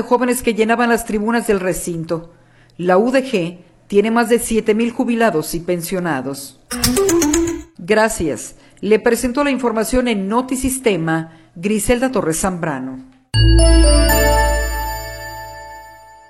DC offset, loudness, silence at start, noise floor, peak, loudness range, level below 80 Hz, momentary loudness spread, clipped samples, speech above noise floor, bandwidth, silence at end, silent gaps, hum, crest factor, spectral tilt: under 0.1%; -17 LUFS; 0 s; -40 dBFS; 0 dBFS; 3 LU; -24 dBFS; 14 LU; under 0.1%; 24 dB; 16.5 kHz; 0.35 s; none; none; 16 dB; -4.5 dB/octave